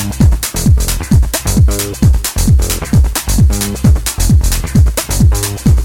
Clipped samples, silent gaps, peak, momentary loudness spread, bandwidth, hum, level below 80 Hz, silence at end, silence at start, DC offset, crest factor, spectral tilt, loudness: under 0.1%; none; 0 dBFS; 2 LU; 17 kHz; none; -14 dBFS; 0 s; 0 s; under 0.1%; 10 dB; -5 dB/octave; -12 LUFS